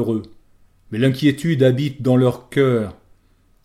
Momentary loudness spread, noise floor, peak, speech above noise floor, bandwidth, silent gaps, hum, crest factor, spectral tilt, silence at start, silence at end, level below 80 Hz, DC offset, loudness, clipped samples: 9 LU; -56 dBFS; -4 dBFS; 39 dB; 13.5 kHz; none; none; 16 dB; -7.5 dB/octave; 0 s; 0.75 s; -54 dBFS; under 0.1%; -18 LUFS; under 0.1%